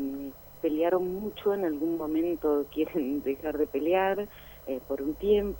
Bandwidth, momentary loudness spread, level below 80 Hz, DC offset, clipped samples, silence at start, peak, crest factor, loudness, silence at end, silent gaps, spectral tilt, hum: 17.5 kHz; 11 LU; -52 dBFS; under 0.1%; under 0.1%; 0 s; -14 dBFS; 16 dB; -29 LUFS; 0 s; none; -7 dB/octave; none